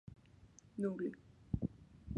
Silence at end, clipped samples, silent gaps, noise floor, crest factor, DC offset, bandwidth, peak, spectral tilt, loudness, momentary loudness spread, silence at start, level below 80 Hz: 0 s; under 0.1%; none; -63 dBFS; 22 dB; under 0.1%; 10.5 kHz; -22 dBFS; -9 dB/octave; -43 LUFS; 23 LU; 0.05 s; -58 dBFS